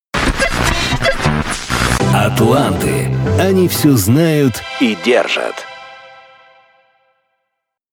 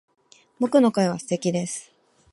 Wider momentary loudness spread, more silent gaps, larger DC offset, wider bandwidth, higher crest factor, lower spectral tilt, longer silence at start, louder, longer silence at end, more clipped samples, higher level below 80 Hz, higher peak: second, 7 LU vs 12 LU; neither; neither; first, 19.5 kHz vs 11.5 kHz; about the same, 14 dB vs 18 dB; about the same, -5 dB/octave vs -5.5 dB/octave; second, 0.15 s vs 0.6 s; first, -14 LUFS vs -23 LUFS; first, 1.75 s vs 0.5 s; neither; first, -30 dBFS vs -70 dBFS; first, -2 dBFS vs -6 dBFS